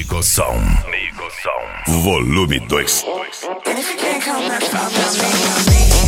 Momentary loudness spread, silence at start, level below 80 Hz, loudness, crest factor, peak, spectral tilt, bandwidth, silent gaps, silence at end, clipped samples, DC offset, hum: 9 LU; 0 s; -22 dBFS; -16 LUFS; 16 dB; 0 dBFS; -3.5 dB/octave; 17.5 kHz; none; 0 s; under 0.1%; under 0.1%; none